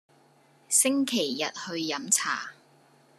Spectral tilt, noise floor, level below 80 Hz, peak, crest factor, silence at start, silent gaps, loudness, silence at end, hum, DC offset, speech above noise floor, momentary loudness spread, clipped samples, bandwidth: -1 dB/octave; -61 dBFS; -88 dBFS; -6 dBFS; 24 dB; 0.7 s; none; -26 LUFS; 0.65 s; none; under 0.1%; 33 dB; 10 LU; under 0.1%; 14 kHz